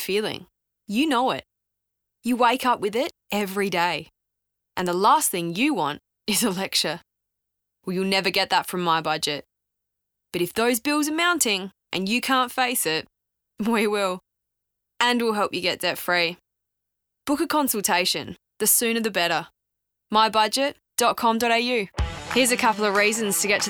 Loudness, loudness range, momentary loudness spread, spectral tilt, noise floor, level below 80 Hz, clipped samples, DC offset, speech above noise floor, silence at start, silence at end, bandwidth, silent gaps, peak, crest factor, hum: -23 LUFS; 3 LU; 10 LU; -2.5 dB/octave; -78 dBFS; -48 dBFS; under 0.1%; under 0.1%; 55 dB; 0 s; 0 s; over 20 kHz; none; -8 dBFS; 16 dB; none